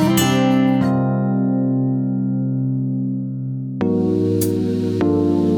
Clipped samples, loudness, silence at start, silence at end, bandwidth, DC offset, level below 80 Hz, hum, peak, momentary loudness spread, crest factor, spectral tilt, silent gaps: under 0.1%; -19 LUFS; 0 s; 0 s; over 20 kHz; under 0.1%; -52 dBFS; none; -4 dBFS; 7 LU; 14 dB; -6.5 dB/octave; none